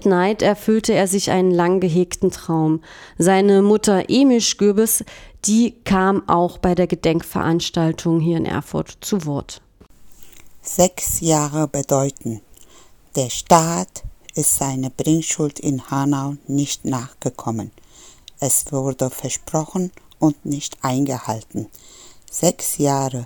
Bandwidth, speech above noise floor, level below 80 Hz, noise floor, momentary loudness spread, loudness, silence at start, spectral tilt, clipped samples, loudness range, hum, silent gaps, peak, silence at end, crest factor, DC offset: over 20 kHz; 28 dB; -46 dBFS; -47 dBFS; 12 LU; -19 LUFS; 0 s; -5 dB/octave; under 0.1%; 6 LU; none; none; 0 dBFS; 0 s; 20 dB; under 0.1%